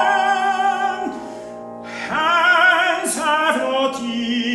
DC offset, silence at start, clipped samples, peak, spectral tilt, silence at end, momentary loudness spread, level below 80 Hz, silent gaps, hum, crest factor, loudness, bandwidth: under 0.1%; 0 s; under 0.1%; -2 dBFS; -2 dB/octave; 0 s; 18 LU; -62 dBFS; none; none; 16 dB; -17 LUFS; 13 kHz